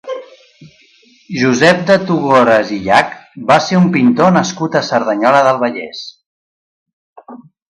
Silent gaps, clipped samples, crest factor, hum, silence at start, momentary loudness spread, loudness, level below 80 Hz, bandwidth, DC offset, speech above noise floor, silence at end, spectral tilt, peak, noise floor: 6.26-6.86 s, 6.93-7.16 s; under 0.1%; 14 dB; none; 0.05 s; 15 LU; -12 LUFS; -54 dBFS; 11 kHz; under 0.1%; 37 dB; 0.35 s; -5.5 dB/octave; 0 dBFS; -49 dBFS